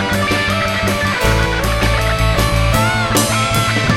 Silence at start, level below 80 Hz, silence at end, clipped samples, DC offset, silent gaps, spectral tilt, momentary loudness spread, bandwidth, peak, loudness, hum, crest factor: 0 s; -22 dBFS; 0 s; under 0.1%; under 0.1%; none; -4 dB/octave; 2 LU; 16.5 kHz; 0 dBFS; -15 LUFS; none; 14 dB